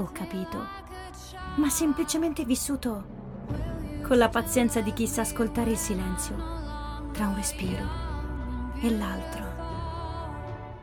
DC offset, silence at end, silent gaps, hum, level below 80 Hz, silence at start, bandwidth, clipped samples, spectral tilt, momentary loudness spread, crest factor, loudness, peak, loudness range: under 0.1%; 0 s; none; none; -40 dBFS; 0 s; 18 kHz; under 0.1%; -4.5 dB/octave; 12 LU; 20 dB; -29 LUFS; -8 dBFS; 5 LU